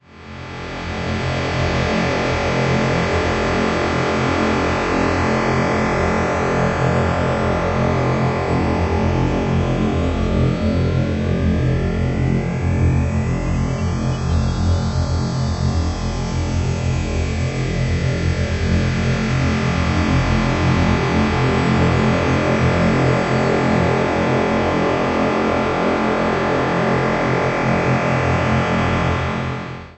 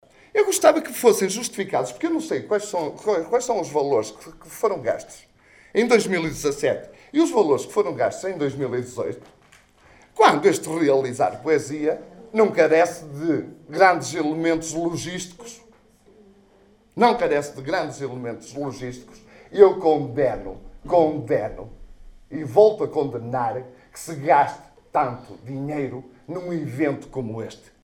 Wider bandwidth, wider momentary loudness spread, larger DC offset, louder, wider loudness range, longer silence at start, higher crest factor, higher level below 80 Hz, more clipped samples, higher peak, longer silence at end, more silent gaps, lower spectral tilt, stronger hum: second, 8.4 kHz vs 19 kHz; second, 4 LU vs 17 LU; neither; first, -18 LUFS vs -22 LUFS; about the same, 4 LU vs 5 LU; second, 0.15 s vs 0.35 s; second, 14 dB vs 22 dB; first, -30 dBFS vs -52 dBFS; neither; second, -4 dBFS vs 0 dBFS; second, 0.05 s vs 0.25 s; neither; first, -6.5 dB/octave vs -4.5 dB/octave; neither